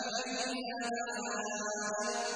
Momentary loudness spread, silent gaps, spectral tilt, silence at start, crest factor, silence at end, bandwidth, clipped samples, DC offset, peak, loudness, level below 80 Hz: 2 LU; none; -1.5 dB/octave; 0 s; 14 dB; 0 s; 10.5 kHz; under 0.1%; under 0.1%; -22 dBFS; -36 LUFS; -76 dBFS